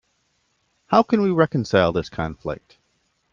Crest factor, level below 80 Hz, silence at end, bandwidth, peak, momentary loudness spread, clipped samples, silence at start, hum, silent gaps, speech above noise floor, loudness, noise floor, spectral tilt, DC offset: 20 dB; -50 dBFS; 0.8 s; 7.4 kHz; -2 dBFS; 14 LU; under 0.1%; 0.9 s; none; none; 48 dB; -21 LUFS; -68 dBFS; -7 dB/octave; under 0.1%